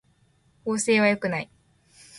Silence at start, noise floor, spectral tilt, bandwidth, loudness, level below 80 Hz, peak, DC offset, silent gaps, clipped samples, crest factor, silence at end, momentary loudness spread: 0.65 s; -63 dBFS; -4 dB/octave; 11.5 kHz; -23 LUFS; -66 dBFS; -10 dBFS; under 0.1%; none; under 0.1%; 18 dB; 0 s; 15 LU